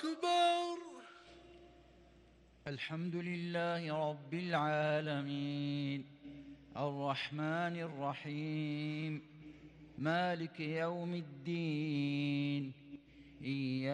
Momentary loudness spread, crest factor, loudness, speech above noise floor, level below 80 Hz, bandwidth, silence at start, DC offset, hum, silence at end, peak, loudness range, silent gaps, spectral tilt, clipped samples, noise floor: 20 LU; 18 dB; -38 LUFS; 26 dB; -74 dBFS; 10.5 kHz; 0 s; under 0.1%; none; 0 s; -22 dBFS; 3 LU; none; -6.5 dB/octave; under 0.1%; -64 dBFS